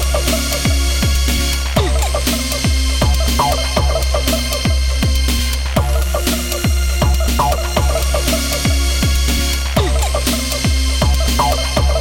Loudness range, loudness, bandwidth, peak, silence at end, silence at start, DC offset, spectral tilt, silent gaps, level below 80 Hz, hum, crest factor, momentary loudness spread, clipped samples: 1 LU; -16 LUFS; 17 kHz; -2 dBFS; 0 s; 0 s; under 0.1%; -4 dB/octave; none; -16 dBFS; none; 12 dB; 2 LU; under 0.1%